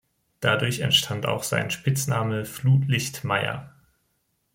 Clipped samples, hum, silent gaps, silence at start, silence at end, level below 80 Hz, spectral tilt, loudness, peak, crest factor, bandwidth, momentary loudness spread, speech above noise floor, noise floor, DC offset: under 0.1%; none; none; 0.4 s; 0.85 s; -60 dBFS; -4 dB/octave; -24 LUFS; -4 dBFS; 20 dB; 16.5 kHz; 7 LU; 48 dB; -72 dBFS; under 0.1%